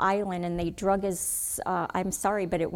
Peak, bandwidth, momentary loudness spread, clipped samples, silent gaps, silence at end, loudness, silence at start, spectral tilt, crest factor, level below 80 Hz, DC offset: -12 dBFS; 18.5 kHz; 3 LU; under 0.1%; none; 0 s; -28 LUFS; 0 s; -4.5 dB/octave; 16 dB; -50 dBFS; under 0.1%